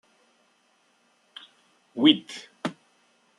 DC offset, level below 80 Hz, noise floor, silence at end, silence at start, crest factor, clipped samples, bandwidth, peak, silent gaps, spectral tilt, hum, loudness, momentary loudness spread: under 0.1%; -80 dBFS; -66 dBFS; 0.7 s; 1.95 s; 26 dB; under 0.1%; 10.5 kHz; -4 dBFS; none; -4.5 dB/octave; none; -24 LUFS; 26 LU